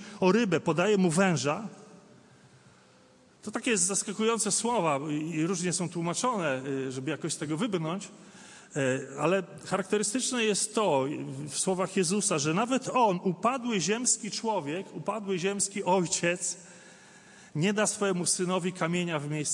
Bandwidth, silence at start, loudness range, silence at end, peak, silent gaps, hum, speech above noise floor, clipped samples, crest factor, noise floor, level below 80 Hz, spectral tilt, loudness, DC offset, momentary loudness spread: 11.5 kHz; 0 s; 4 LU; 0 s; -10 dBFS; none; none; 31 dB; under 0.1%; 20 dB; -59 dBFS; -76 dBFS; -4 dB/octave; -28 LUFS; under 0.1%; 9 LU